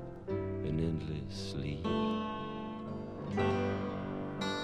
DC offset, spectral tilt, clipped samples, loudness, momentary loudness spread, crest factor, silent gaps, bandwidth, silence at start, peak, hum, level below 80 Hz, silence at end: under 0.1%; -7 dB/octave; under 0.1%; -37 LUFS; 8 LU; 16 dB; none; 11.5 kHz; 0 s; -20 dBFS; none; -52 dBFS; 0 s